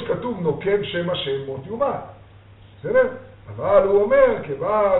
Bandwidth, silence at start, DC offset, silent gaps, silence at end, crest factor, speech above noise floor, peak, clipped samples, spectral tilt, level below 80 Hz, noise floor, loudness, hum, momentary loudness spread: 4.1 kHz; 0 s; under 0.1%; none; 0 s; 18 dB; 26 dB; -2 dBFS; under 0.1%; -4 dB/octave; -48 dBFS; -46 dBFS; -21 LUFS; none; 16 LU